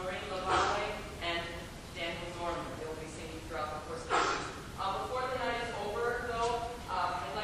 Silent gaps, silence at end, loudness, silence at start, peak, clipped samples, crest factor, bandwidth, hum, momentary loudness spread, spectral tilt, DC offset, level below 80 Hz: none; 0 s; -36 LUFS; 0 s; -16 dBFS; under 0.1%; 20 dB; 15.5 kHz; none; 11 LU; -3.5 dB/octave; under 0.1%; -52 dBFS